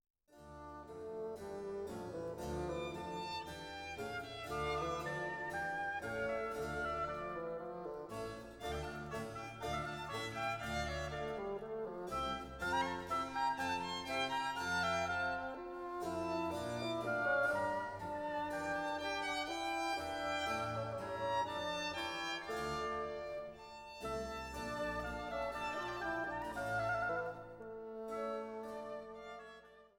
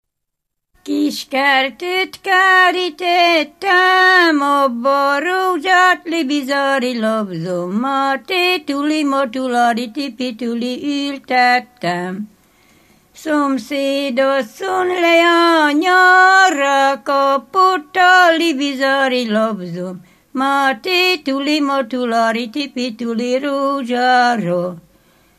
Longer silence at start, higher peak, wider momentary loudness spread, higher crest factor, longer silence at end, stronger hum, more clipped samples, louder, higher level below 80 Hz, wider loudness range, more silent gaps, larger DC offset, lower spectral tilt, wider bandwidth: second, 0.3 s vs 0.85 s; second, -24 dBFS vs 0 dBFS; about the same, 10 LU vs 11 LU; about the same, 18 dB vs 16 dB; second, 0.1 s vs 0.6 s; neither; neither; second, -41 LUFS vs -15 LUFS; first, -60 dBFS vs -66 dBFS; about the same, 5 LU vs 7 LU; neither; neither; about the same, -4.5 dB/octave vs -3.5 dB/octave; first, 17 kHz vs 14.5 kHz